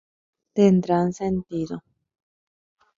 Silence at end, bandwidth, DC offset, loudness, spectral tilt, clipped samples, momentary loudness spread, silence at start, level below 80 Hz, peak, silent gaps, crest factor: 1.2 s; 7.6 kHz; under 0.1%; -22 LUFS; -8 dB/octave; under 0.1%; 14 LU; 0.55 s; -58 dBFS; -6 dBFS; none; 20 dB